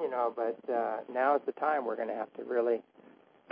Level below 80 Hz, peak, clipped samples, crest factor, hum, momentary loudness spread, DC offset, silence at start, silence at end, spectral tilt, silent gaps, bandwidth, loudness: under -90 dBFS; -16 dBFS; under 0.1%; 16 dB; none; 7 LU; under 0.1%; 0 s; 0.7 s; -3.5 dB/octave; none; 5 kHz; -32 LUFS